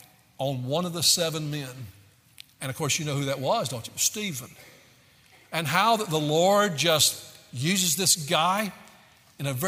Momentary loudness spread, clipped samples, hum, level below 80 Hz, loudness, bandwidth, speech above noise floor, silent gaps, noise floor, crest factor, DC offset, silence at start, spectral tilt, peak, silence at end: 15 LU; under 0.1%; none; -68 dBFS; -24 LUFS; 16 kHz; 32 dB; none; -57 dBFS; 20 dB; under 0.1%; 0.4 s; -3 dB/octave; -6 dBFS; 0 s